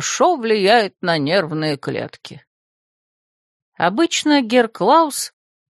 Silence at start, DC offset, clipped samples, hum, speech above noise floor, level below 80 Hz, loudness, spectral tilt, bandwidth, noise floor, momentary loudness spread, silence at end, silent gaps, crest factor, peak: 0 s; under 0.1%; under 0.1%; none; over 73 dB; -68 dBFS; -17 LUFS; -3.5 dB/octave; 13 kHz; under -90 dBFS; 12 LU; 0.45 s; 2.47-3.72 s; 18 dB; 0 dBFS